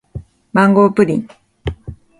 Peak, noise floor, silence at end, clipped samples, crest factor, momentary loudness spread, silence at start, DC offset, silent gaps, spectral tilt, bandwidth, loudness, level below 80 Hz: 0 dBFS; -34 dBFS; 0.25 s; under 0.1%; 16 dB; 23 LU; 0.15 s; under 0.1%; none; -8 dB/octave; 11.5 kHz; -14 LUFS; -38 dBFS